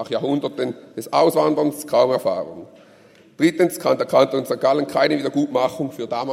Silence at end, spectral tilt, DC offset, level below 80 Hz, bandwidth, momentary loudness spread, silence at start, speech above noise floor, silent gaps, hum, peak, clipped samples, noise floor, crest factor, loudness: 0 s; -5.5 dB/octave; under 0.1%; -68 dBFS; 16 kHz; 10 LU; 0 s; 30 dB; none; none; 0 dBFS; under 0.1%; -50 dBFS; 20 dB; -20 LUFS